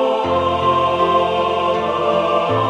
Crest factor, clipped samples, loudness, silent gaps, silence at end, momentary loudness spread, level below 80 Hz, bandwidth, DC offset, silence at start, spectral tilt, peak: 12 dB; under 0.1%; -17 LUFS; none; 0 s; 2 LU; -46 dBFS; 10.5 kHz; under 0.1%; 0 s; -6 dB/octave; -4 dBFS